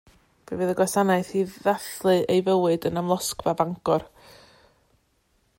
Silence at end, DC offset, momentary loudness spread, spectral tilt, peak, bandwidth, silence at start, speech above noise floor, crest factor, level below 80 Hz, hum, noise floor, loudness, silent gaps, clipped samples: 1.5 s; under 0.1%; 6 LU; -5 dB/octave; -6 dBFS; 16.5 kHz; 0.5 s; 44 dB; 18 dB; -60 dBFS; none; -67 dBFS; -24 LUFS; none; under 0.1%